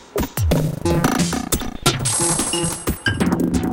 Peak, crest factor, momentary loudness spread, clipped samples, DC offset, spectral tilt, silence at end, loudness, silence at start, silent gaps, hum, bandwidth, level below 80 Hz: -2 dBFS; 18 dB; 5 LU; under 0.1%; under 0.1%; -4 dB/octave; 0 s; -19 LUFS; 0 s; none; none; 17 kHz; -32 dBFS